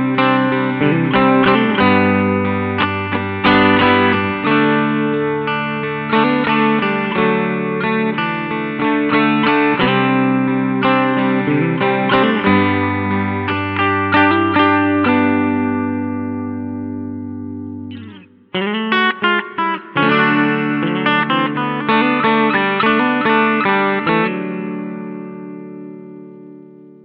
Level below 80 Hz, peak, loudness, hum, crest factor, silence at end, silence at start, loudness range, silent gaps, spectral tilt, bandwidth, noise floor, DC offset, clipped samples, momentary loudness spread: -52 dBFS; -2 dBFS; -15 LUFS; none; 14 dB; 0.15 s; 0 s; 6 LU; none; -9.5 dB/octave; 5.4 kHz; -39 dBFS; under 0.1%; under 0.1%; 13 LU